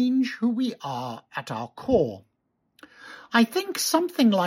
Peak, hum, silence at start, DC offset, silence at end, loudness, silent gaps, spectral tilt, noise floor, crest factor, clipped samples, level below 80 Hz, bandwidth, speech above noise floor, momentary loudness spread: -6 dBFS; none; 0 s; under 0.1%; 0 s; -25 LUFS; none; -4.5 dB/octave; -66 dBFS; 18 dB; under 0.1%; -58 dBFS; 16.5 kHz; 42 dB; 13 LU